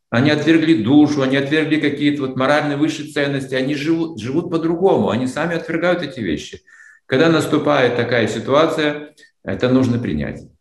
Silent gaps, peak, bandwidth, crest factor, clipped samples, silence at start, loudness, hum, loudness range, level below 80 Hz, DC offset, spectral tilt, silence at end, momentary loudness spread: none; 0 dBFS; 12 kHz; 16 dB; under 0.1%; 0.1 s; -17 LUFS; none; 3 LU; -50 dBFS; under 0.1%; -6 dB/octave; 0.15 s; 9 LU